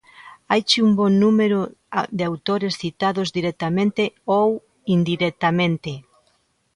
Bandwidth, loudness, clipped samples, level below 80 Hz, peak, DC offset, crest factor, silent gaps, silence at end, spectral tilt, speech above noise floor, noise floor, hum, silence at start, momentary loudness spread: 11 kHz; -20 LUFS; under 0.1%; -58 dBFS; -2 dBFS; under 0.1%; 18 dB; none; 0.75 s; -6 dB/octave; 45 dB; -65 dBFS; none; 0.2 s; 9 LU